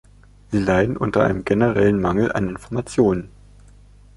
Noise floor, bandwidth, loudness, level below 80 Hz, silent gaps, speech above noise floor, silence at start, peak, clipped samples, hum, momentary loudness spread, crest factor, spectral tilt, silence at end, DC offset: -47 dBFS; 11.5 kHz; -20 LUFS; -42 dBFS; none; 28 dB; 0.5 s; -4 dBFS; under 0.1%; 50 Hz at -35 dBFS; 8 LU; 16 dB; -7.5 dB/octave; 0.9 s; under 0.1%